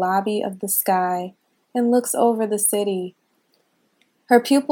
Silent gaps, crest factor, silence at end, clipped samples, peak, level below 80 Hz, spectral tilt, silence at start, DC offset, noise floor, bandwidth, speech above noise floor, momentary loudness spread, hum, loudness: none; 22 dB; 0.05 s; under 0.1%; 0 dBFS; -80 dBFS; -4 dB/octave; 0 s; under 0.1%; -65 dBFS; 18 kHz; 46 dB; 11 LU; none; -20 LUFS